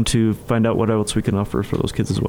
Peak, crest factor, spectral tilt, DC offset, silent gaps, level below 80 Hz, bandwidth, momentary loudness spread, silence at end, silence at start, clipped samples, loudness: -4 dBFS; 16 dB; -6 dB/octave; under 0.1%; none; -36 dBFS; 16.5 kHz; 4 LU; 0 s; 0 s; under 0.1%; -20 LUFS